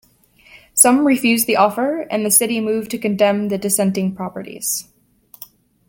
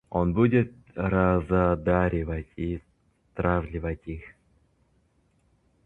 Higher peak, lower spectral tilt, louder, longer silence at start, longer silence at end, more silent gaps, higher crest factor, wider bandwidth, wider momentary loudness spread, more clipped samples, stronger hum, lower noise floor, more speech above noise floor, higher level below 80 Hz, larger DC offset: first, 0 dBFS vs -8 dBFS; second, -3.5 dB/octave vs -10.5 dB/octave; first, -16 LUFS vs -26 LUFS; first, 0.75 s vs 0.1 s; second, 1.05 s vs 1.6 s; neither; about the same, 18 dB vs 20 dB; first, 17 kHz vs 4 kHz; second, 11 LU vs 14 LU; neither; neither; second, -51 dBFS vs -67 dBFS; second, 34 dB vs 42 dB; second, -60 dBFS vs -40 dBFS; neither